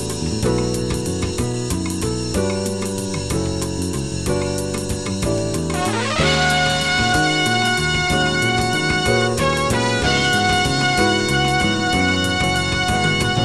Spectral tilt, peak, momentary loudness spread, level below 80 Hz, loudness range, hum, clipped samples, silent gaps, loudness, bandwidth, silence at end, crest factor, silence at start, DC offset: -4 dB/octave; -4 dBFS; 7 LU; -34 dBFS; 5 LU; none; under 0.1%; none; -18 LUFS; 15.5 kHz; 0 s; 14 dB; 0 s; 0.8%